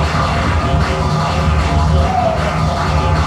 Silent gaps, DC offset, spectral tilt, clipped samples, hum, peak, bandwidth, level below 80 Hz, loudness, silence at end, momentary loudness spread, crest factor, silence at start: none; under 0.1%; -6 dB/octave; under 0.1%; none; -2 dBFS; 11.5 kHz; -20 dBFS; -15 LUFS; 0 s; 2 LU; 12 dB; 0 s